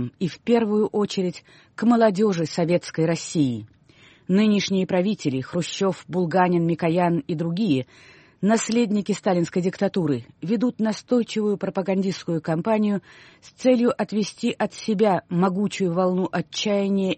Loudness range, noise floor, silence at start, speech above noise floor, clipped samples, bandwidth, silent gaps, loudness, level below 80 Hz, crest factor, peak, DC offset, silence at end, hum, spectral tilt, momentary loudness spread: 2 LU; -53 dBFS; 0 s; 31 dB; under 0.1%; 8.8 kHz; none; -23 LUFS; -64 dBFS; 16 dB; -6 dBFS; under 0.1%; 0 s; none; -6 dB/octave; 7 LU